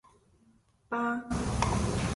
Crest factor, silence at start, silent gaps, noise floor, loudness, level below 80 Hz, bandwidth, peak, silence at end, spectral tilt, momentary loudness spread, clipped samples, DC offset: 20 dB; 0.9 s; none; -65 dBFS; -31 LUFS; -42 dBFS; 11.5 kHz; -12 dBFS; 0 s; -5.5 dB/octave; 4 LU; under 0.1%; under 0.1%